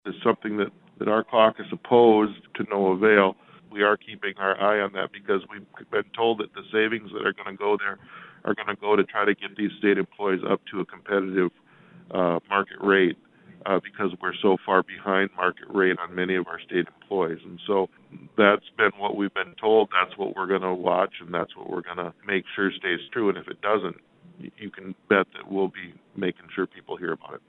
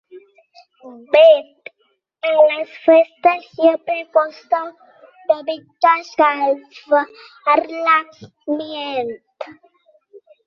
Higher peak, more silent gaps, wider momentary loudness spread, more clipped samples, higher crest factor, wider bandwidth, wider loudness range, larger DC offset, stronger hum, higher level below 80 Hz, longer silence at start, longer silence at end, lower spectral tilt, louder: about the same, -2 dBFS vs -2 dBFS; neither; second, 13 LU vs 18 LU; neither; first, 24 dB vs 16 dB; second, 4.1 kHz vs 6.2 kHz; about the same, 6 LU vs 5 LU; neither; neither; about the same, -72 dBFS vs -72 dBFS; about the same, 0.05 s vs 0.15 s; second, 0.1 s vs 0.95 s; first, -9 dB/octave vs -4.5 dB/octave; second, -25 LUFS vs -17 LUFS